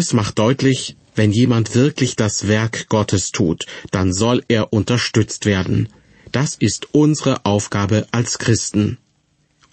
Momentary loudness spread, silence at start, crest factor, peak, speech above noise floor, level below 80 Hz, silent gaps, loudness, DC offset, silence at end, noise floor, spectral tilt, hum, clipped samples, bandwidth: 6 LU; 0 s; 16 dB; -2 dBFS; 45 dB; -46 dBFS; none; -18 LUFS; under 0.1%; 0.75 s; -62 dBFS; -5 dB/octave; none; under 0.1%; 8.8 kHz